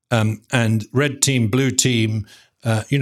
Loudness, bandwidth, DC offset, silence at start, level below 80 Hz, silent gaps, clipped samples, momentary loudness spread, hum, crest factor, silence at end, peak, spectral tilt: -19 LUFS; 15 kHz; under 0.1%; 0.1 s; -58 dBFS; none; under 0.1%; 8 LU; none; 18 dB; 0 s; 0 dBFS; -4.5 dB/octave